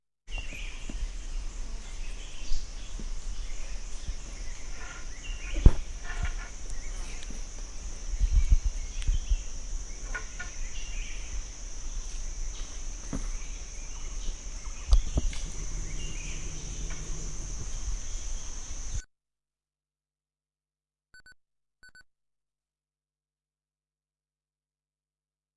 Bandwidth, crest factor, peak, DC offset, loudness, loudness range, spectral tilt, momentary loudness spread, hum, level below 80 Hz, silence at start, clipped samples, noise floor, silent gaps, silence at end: 11 kHz; 30 dB; -2 dBFS; under 0.1%; -37 LUFS; 8 LU; -4 dB/octave; 12 LU; none; -32 dBFS; 0.25 s; under 0.1%; under -90 dBFS; none; 3.55 s